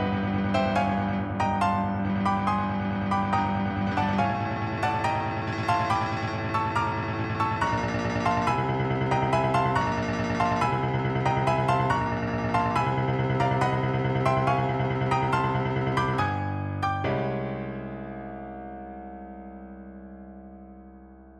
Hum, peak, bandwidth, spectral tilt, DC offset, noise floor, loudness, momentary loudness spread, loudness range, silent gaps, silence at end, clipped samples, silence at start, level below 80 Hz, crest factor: none; -10 dBFS; 10 kHz; -7 dB/octave; under 0.1%; -48 dBFS; -26 LUFS; 15 LU; 7 LU; none; 0 s; under 0.1%; 0 s; -46 dBFS; 16 dB